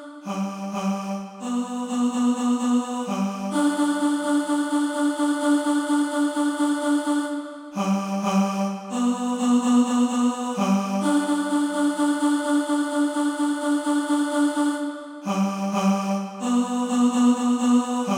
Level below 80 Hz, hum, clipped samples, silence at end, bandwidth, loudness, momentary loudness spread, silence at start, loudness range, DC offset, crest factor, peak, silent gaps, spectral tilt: -76 dBFS; none; under 0.1%; 0 s; 14 kHz; -23 LUFS; 8 LU; 0 s; 2 LU; under 0.1%; 12 dB; -10 dBFS; none; -5 dB/octave